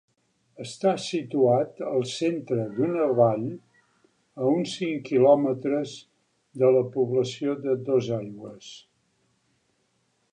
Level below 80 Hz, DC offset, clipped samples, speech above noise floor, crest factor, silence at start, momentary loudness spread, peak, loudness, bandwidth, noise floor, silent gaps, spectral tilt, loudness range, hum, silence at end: -72 dBFS; under 0.1%; under 0.1%; 47 dB; 20 dB; 0.6 s; 19 LU; -6 dBFS; -25 LUFS; 10.5 kHz; -71 dBFS; none; -6.5 dB/octave; 3 LU; none; 1.55 s